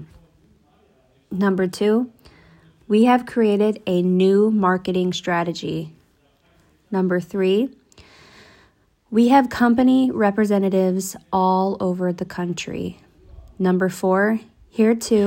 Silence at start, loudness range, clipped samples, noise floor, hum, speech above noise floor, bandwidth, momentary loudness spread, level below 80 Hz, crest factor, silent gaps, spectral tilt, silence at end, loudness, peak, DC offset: 0 s; 6 LU; under 0.1%; -60 dBFS; none; 41 dB; 16.5 kHz; 11 LU; -56 dBFS; 18 dB; none; -6.5 dB/octave; 0 s; -20 LUFS; -2 dBFS; under 0.1%